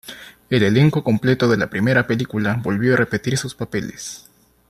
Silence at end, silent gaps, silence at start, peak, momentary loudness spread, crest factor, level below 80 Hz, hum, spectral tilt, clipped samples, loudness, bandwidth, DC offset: 0.5 s; none; 0.05 s; -2 dBFS; 16 LU; 16 dB; -52 dBFS; none; -6 dB/octave; under 0.1%; -19 LUFS; 13 kHz; under 0.1%